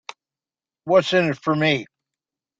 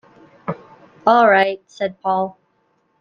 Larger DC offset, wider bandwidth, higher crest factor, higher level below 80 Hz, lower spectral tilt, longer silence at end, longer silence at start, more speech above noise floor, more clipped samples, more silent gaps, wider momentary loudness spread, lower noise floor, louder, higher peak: neither; about the same, 7.8 kHz vs 7.2 kHz; about the same, 20 dB vs 18 dB; about the same, -62 dBFS vs -66 dBFS; about the same, -5.5 dB/octave vs -6 dB/octave; about the same, 0.75 s vs 0.7 s; first, 0.85 s vs 0.45 s; first, over 71 dB vs 48 dB; neither; neither; about the same, 17 LU vs 18 LU; first, under -90 dBFS vs -64 dBFS; second, -20 LUFS vs -17 LUFS; about the same, -4 dBFS vs -2 dBFS